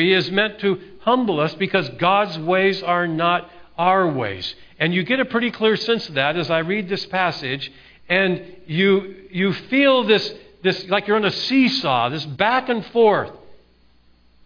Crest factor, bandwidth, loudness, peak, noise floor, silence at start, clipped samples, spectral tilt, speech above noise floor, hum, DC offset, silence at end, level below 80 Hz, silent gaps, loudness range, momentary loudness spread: 20 dB; 5.4 kHz; -19 LUFS; 0 dBFS; -54 dBFS; 0 s; under 0.1%; -6 dB/octave; 34 dB; none; under 0.1%; 0.9 s; -58 dBFS; none; 2 LU; 8 LU